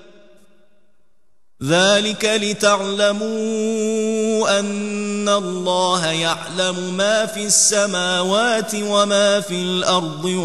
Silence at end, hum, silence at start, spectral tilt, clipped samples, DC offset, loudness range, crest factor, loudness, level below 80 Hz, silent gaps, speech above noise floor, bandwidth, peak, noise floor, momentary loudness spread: 0 s; none; 1.6 s; -2.5 dB/octave; under 0.1%; 0.5%; 3 LU; 18 dB; -18 LUFS; -64 dBFS; none; 51 dB; 12.5 kHz; 0 dBFS; -69 dBFS; 7 LU